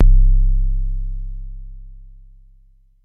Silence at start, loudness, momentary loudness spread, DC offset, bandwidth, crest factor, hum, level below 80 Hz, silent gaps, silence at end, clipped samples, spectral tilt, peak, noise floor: 0 s; -22 LUFS; 24 LU; under 0.1%; 0.3 kHz; 14 dB; 50 Hz at -40 dBFS; -16 dBFS; none; 1.1 s; under 0.1%; -11.5 dB/octave; -2 dBFS; -51 dBFS